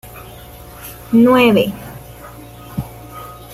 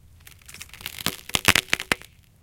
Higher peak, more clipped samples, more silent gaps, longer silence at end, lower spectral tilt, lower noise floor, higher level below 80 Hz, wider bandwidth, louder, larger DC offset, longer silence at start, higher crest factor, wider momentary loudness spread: about the same, -2 dBFS vs 0 dBFS; neither; neither; second, 0 s vs 0.45 s; first, -6 dB/octave vs -1.5 dB/octave; second, -36 dBFS vs -49 dBFS; first, -42 dBFS vs -50 dBFS; about the same, 16 kHz vs 17 kHz; first, -12 LUFS vs -23 LUFS; neither; second, 0.05 s vs 0.5 s; second, 16 dB vs 28 dB; first, 25 LU vs 22 LU